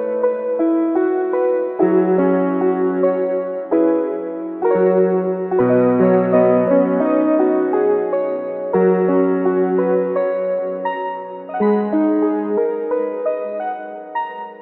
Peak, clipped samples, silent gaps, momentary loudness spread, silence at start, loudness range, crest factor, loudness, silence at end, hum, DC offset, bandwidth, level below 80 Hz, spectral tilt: -4 dBFS; under 0.1%; none; 10 LU; 0 s; 4 LU; 14 dB; -17 LUFS; 0 s; none; under 0.1%; 4.1 kHz; -66 dBFS; -12 dB/octave